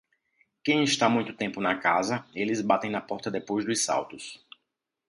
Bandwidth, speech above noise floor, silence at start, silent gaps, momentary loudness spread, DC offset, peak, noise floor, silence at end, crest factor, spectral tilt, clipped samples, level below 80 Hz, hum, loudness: 11.5 kHz; 55 dB; 0.65 s; none; 10 LU; under 0.1%; -8 dBFS; -82 dBFS; 0.75 s; 20 dB; -3.5 dB/octave; under 0.1%; -70 dBFS; none; -27 LUFS